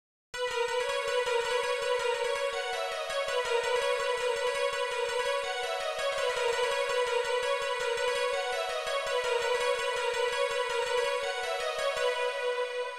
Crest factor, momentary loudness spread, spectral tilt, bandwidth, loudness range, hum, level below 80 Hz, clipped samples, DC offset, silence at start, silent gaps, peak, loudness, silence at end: 14 dB; 3 LU; 1 dB/octave; 14.5 kHz; 1 LU; none; -62 dBFS; under 0.1%; 0.1%; 0.35 s; none; -16 dBFS; -30 LUFS; 0 s